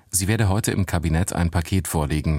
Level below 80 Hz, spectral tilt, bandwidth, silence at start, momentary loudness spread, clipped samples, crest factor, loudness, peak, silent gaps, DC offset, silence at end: -32 dBFS; -5 dB/octave; 16.5 kHz; 0.15 s; 3 LU; under 0.1%; 16 dB; -22 LUFS; -6 dBFS; none; under 0.1%; 0 s